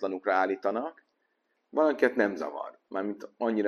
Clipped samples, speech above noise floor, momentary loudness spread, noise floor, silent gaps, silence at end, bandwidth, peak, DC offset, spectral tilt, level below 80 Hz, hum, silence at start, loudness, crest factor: under 0.1%; 47 dB; 12 LU; -76 dBFS; none; 0 s; 11 kHz; -10 dBFS; under 0.1%; -6.5 dB/octave; -76 dBFS; none; 0 s; -29 LUFS; 20 dB